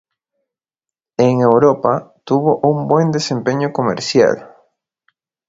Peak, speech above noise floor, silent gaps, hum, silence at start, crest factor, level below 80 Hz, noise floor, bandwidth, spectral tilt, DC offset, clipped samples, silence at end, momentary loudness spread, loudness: 0 dBFS; 73 dB; none; none; 1.2 s; 16 dB; -56 dBFS; -87 dBFS; 7.8 kHz; -6 dB/octave; under 0.1%; under 0.1%; 1.05 s; 7 LU; -15 LUFS